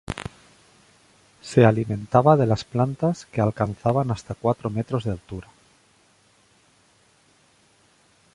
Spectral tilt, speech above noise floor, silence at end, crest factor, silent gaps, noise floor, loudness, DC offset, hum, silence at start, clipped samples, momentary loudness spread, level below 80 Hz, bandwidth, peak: -7.5 dB/octave; 38 dB; 2.95 s; 22 dB; none; -60 dBFS; -22 LUFS; under 0.1%; none; 0.1 s; under 0.1%; 17 LU; -50 dBFS; 11.5 kHz; -2 dBFS